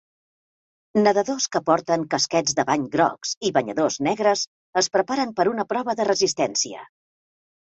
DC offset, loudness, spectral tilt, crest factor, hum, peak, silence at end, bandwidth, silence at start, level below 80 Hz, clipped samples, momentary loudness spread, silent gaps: under 0.1%; -22 LUFS; -3 dB/octave; 18 dB; none; -4 dBFS; 0.9 s; 8.2 kHz; 0.95 s; -66 dBFS; under 0.1%; 5 LU; 3.37-3.41 s, 4.47-4.73 s